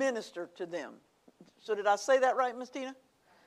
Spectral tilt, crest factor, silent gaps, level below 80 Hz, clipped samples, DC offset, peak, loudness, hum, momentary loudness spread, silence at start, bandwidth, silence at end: -2.5 dB/octave; 18 dB; none; -88 dBFS; under 0.1%; under 0.1%; -16 dBFS; -32 LUFS; none; 17 LU; 0 s; 12.5 kHz; 0.55 s